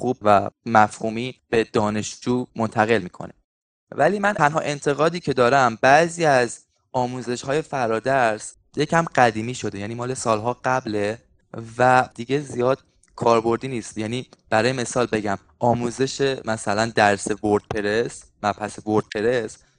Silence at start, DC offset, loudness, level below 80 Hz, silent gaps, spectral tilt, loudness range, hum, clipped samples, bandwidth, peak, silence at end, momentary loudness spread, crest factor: 0 s; under 0.1%; -22 LUFS; -56 dBFS; 3.44-3.87 s; -5 dB/octave; 4 LU; none; under 0.1%; 10 kHz; 0 dBFS; 0.25 s; 11 LU; 22 dB